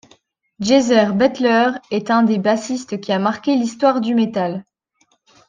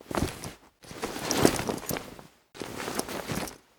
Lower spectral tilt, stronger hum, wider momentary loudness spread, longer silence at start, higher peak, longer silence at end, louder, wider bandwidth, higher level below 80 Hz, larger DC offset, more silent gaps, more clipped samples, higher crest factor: first, -5.5 dB/octave vs -4 dB/octave; neither; second, 10 LU vs 21 LU; first, 0.6 s vs 0 s; about the same, -2 dBFS vs -2 dBFS; first, 0.85 s vs 0.2 s; first, -17 LUFS vs -31 LUFS; second, 9.6 kHz vs over 20 kHz; second, -62 dBFS vs -50 dBFS; neither; neither; neither; second, 16 dB vs 30 dB